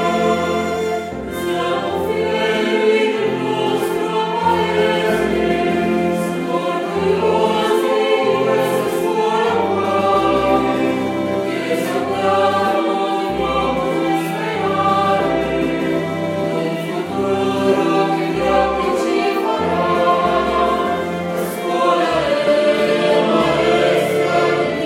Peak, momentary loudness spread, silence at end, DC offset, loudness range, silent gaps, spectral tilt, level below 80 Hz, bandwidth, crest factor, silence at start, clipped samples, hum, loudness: -2 dBFS; 5 LU; 0 s; under 0.1%; 2 LU; none; -5.5 dB/octave; -44 dBFS; 16.5 kHz; 14 dB; 0 s; under 0.1%; none; -17 LUFS